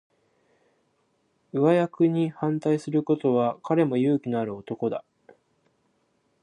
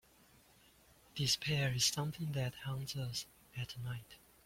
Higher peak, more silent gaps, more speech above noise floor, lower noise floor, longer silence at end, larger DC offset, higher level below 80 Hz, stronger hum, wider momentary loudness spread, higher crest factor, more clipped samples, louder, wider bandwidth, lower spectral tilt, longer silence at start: first, -8 dBFS vs -20 dBFS; neither; first, 46 dB vs 28 dB; first, -70 dBFS vs -66 dBFS; first, 1.45 s vs 0.3 s; neither; second, -74 dBFS vs -66 dBFS; neither; second, 9 LU vs 15 LU; about the same, 18 dB vs 22 dB; neither; first, -25 LUFS vs -38 LUFS; second, 10 kHz vs 16.5 kHz; first, -8.5 dB/octave vs -3.5 dB/octave; first, 1.55 s vs 1.15 s